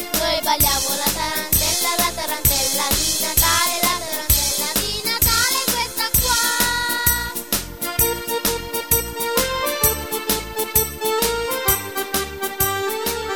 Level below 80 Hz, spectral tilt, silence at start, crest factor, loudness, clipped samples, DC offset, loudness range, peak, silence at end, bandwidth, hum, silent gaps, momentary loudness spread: -34 dBFS; -1.5 dB/octave; 0 s; 20 dB; -18 LUFS; under 0.1%; under 0.1%; 3 LU; 0 dBFS; 0 s; 17.5 kHz; none; none; 6 LU